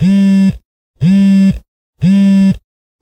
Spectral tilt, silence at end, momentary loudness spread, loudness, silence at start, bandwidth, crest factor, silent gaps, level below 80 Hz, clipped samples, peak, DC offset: -8 dB/octave; 0.45 s; 12 LU; -10 LUFS; 0 s; 8.6 kHz; 8 dB; 0.65-0.94 s, 1.68-1.93 s; -36 dBFS; under 0.1%; -2 dBFS; under 0.1%